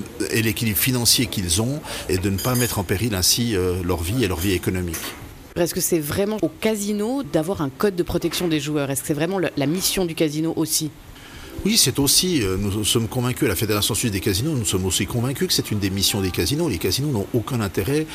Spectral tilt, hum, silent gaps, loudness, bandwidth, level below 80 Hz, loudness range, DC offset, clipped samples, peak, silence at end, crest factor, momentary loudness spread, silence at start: -4 dB/octave; none; none; -21 LUFS; 15.5 kHz; -42 dBFS; 3 LU; under 0.1%; under 0.1%; -6 dBFS; 0 s; 16 dB; 8 LU; 0 s